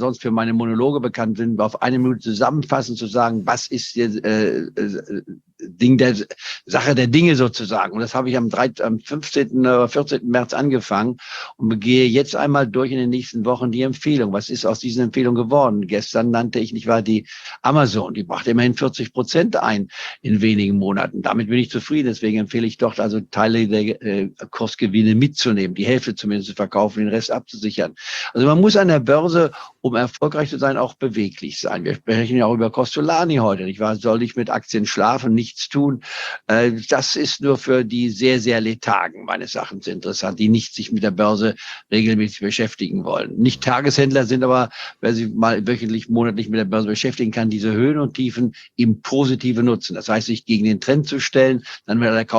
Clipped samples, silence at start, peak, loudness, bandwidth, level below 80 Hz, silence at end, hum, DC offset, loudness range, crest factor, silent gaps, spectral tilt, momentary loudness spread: under 0.1%; 0 s; -2 dBFS; -19 LUFS; 7.8 kHz; -60 dBFS; 0 s; none; under 0.1%; 2 LU; 18 dB; none; -6 dB/octave; 8 LU